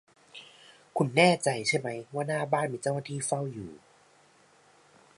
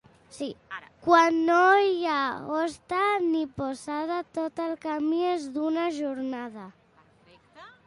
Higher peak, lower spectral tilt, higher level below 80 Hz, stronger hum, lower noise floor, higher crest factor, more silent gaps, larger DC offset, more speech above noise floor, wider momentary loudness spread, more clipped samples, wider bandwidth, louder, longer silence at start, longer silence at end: about the same, -8 dBFS vs -8 dBFS; about the same, -4.5 dB/octave vs -4.5 dB/octave; second, -72 dBFS vs -66 dBFS; neither; about the same, -61 dBFS vs -60 dBFS; about the same, 24 dB vs 20 dB; neither; neither; about the same, 33 dB vs 34 dB; first, 24 LU vs 17 LU; neither; about the same, 11.5 kHz vs 11.5 kHz; about the same, -28 LUFS vs -26 LUFS; about the same, 0.35 s vs 0.35 s; first, 1.4 s vs 0.15 s